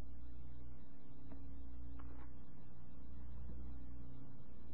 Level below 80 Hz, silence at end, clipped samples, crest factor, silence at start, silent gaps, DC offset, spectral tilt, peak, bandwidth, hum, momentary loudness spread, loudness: -56 dBFS; 0 s; under 0.1%; 12 dB; 0 s; none; 1%; -9 dB/octave; -34 dBFS; 4 kHz; none; 6 LU; -57 LUFS